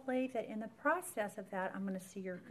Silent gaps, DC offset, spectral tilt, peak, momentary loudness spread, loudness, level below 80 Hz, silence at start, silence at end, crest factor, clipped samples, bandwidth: none; under 0.1%; -5.5 dB/octave; -20 dBFS; 9 LU; -40 LUFS; -82 dBFS; 0 s; 0 s; 20 dB; under 0.1%; 15 kHz